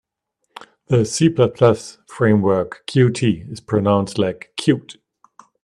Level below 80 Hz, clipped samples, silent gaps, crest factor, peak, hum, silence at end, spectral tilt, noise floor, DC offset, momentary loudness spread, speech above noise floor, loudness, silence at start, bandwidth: -56 dBFS; under 0.1%; none; 18 dB; 0 dBFS; none; 0.7 s; -6.5 dB/octave; -74 dBFS; under 0.1%; 7 LU; 56 dB; -18 LUFS; 0.9 s; 11.5 kHz